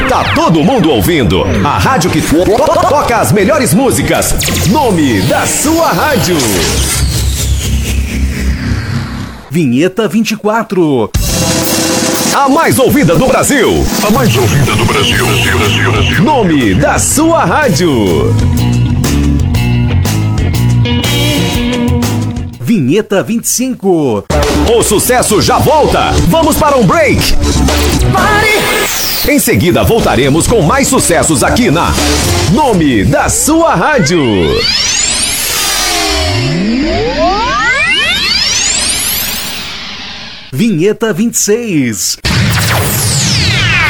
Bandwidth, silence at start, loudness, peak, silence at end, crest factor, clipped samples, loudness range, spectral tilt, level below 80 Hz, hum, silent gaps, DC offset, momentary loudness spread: over 20 kHz; 0 s; -9 LUFS; 0 dBFS; 0 s; 10 dB; under 0.1%; 3 LU; -4 dB/octave; -22 dBFS; none; none; under 0.1%; 5 LU